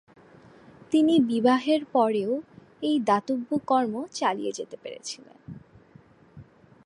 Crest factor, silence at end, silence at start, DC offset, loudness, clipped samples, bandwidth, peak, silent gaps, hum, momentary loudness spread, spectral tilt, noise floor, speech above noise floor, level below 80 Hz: 18 dB; 0.4 s; 0.9 s; under 0.1%; -25 LUFS; under 0.1%; 11.5 kHz; -8 dBFS; none; none; 17 LU; -5 dB/octave; -55 dBFS; 30 dB; -68 dBFS